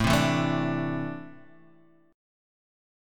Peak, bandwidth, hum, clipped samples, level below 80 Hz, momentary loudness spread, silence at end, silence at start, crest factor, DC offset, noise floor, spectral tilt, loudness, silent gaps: -8 dBFS; 17.5 kHz; none; under 0.1%; -48 dBFS; 18 LU; 0.95 s; 0 s; 20 dB; under 0.1%; -59 dBFS; -5.5 dB/octave; -27 LUFS; none